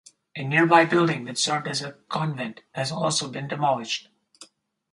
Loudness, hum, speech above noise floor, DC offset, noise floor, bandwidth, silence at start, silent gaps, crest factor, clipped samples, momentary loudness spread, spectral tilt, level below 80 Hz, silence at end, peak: -24 LUFS; none; 28 dB; under 0.1%; -52 dBFS; 11.5 kHz; 0.35 s; none; 24 dB; under 0.1%; 14 LU; -4 dB/octave; -70 dBFS; 0.5 s; -2 dBFS